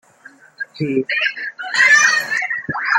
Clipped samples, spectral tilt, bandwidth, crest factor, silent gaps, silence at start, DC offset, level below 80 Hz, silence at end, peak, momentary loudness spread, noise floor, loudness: under 0.1%; -2 dB/octave; 16.5 kHz; 18 dB; none; 0.6 s; under 0.1%; -64 dBFS; 0 s; -2 dBFS; 16 LU; -45 dBFS; -15 LUFS